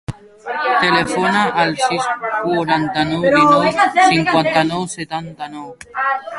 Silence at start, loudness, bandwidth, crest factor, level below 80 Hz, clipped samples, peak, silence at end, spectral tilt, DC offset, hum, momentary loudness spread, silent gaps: 0.1 s; -15 LUFS; 11.5 kHz; 16 dB; -50 dBFS; under 0.1%; -2 dBFS; 0 s; -4.5 dB/octave; under 0.1%; none; 17 LU; none